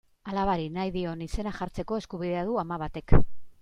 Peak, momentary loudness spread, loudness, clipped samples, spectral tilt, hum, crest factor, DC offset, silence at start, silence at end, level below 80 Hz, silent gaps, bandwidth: -4 dBFS; 9 LU; -30 LUFS; under 0.1%; -7.5 dB/octave; none; 22 dB; under 0.1%; 0.25 s; 0.1 s; -36 dBFS; none; 8.8 kHz